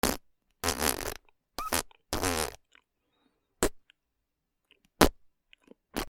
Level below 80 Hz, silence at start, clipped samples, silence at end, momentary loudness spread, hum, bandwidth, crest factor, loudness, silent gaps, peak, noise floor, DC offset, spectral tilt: -46 dBFS; 0.05 s; under 0.1%; 0.05 s; 14 LU; none; 19 kHz; 34 dB; -31 LUFS; none; 0 dBFS; -82 dBFS; under 0.1%; -3 dB/octave